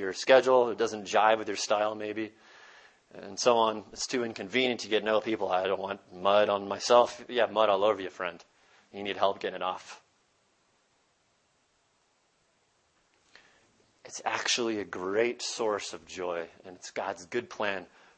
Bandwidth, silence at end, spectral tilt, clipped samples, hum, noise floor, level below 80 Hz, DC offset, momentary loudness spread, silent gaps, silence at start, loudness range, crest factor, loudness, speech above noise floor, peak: 8.8 kHz; 0.3 s; -2.5 dB/octave; under 0.1%; none; -71 dBFS; -74 dBFS; under 0.1%; 14 LU; none; 0 s; 9 LU; 24 dB; -29 LUFS; 42 dB; -6 dBFS